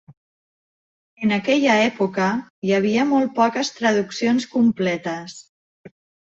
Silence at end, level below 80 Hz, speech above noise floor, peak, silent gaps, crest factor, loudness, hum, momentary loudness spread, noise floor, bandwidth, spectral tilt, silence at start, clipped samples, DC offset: 0.4 s; -66 dBFS; over 70 dB; -6 dBFS; 2.50-2.62 s, 5.49-5.84 s; 16 dB; -20 LUFS; none; 8 LU; under -90 dBFS; 8 kHz; -5 dB/octave; 1.2 s; under 0.1%; under 0.1%